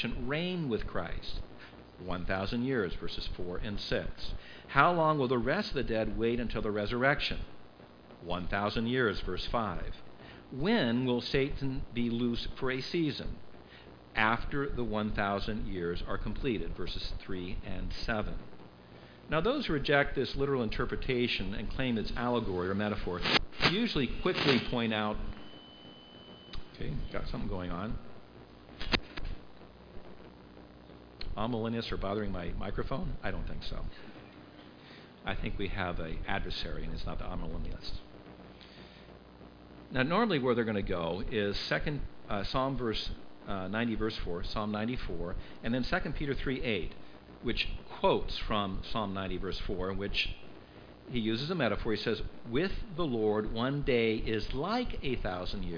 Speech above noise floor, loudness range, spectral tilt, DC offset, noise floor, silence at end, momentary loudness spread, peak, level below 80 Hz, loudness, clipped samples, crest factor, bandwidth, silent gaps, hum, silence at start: 21 dB; 9 LU; -6.5 dB/octave; under 0.1%; -53 dBFS; 0 s; 22 LU; -6 dBFS; -42 dBFS; -33 LUFS; under 0.1%; 26 dB; 5.2 kHz; none; none; 0 s